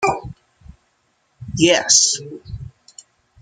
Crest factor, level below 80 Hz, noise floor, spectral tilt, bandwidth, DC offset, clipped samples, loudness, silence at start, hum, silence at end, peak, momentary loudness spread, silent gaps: 22 dB; -46 dBFS; -65 dBFS; -2 dB/octave; 11 kHz; under 0.1%; under 0.1%; -14 LUFS; 0 s; none; 0.75 s; 0 dBFS; 25 LU; none